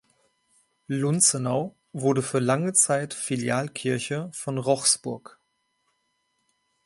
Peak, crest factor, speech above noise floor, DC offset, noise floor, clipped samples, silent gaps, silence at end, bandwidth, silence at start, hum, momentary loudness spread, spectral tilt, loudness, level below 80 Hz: -6 dBFS; 20 dB; 49 dB; under 0.1%; -74 dBFS; under 0.1%; none; 1.65 s; 11.5 kHz; 0.9 s; none; 11 LU; -3.5 dB/octave; -24 LUFS; -70 dBFS